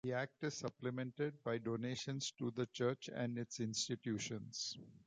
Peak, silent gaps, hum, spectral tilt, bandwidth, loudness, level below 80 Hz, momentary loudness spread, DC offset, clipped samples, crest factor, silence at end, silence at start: -24 dBFS; none; none; -4.5 dB/octave; 9.6 kHz; -43 LUFS; -78 dBFS; 4 LU; under 0.1%; under 0.1%; 18 dB; 0.1 s; 0.05 s